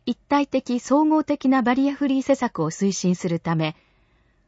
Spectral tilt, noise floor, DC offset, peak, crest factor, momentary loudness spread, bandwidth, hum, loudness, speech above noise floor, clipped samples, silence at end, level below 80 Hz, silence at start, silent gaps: -6 dB/octave; -61 dBFS; under 0.1%; -6 dBFS; 16 dB; 6 LU; 8 kHz; none; -22 LUFS; 40 dB; under 0.1%; 0.75 s; -60 dBFS; 0.05 s; none